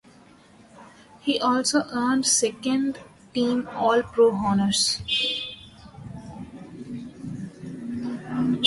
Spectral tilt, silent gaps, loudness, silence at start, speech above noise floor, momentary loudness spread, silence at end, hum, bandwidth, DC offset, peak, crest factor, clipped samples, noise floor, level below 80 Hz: -3 dB/octave; none; -23 LUFS; 0.75 s; 30 dB; 20 LU; 0 s; none; 11.5 kHz; under 0.1%; -4 dBFS; 22 dB; under 0.1%; -52 dBFS; -56 dBFS